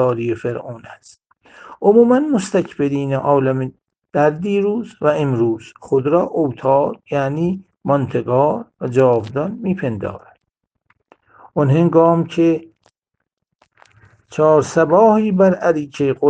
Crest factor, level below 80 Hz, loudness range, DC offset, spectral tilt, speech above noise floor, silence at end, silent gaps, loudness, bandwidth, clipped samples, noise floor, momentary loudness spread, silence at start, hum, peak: 16 dB; -58 dBFS; 3 LU; under 0.1%; -8 dB/octave; 61 dB; 0 s; 13.33-13.37 s; -17 LUFS; 9.4 kHz; under 0.1%; -77 dBFS; 12 LU; 0 s; none; 0 dBFS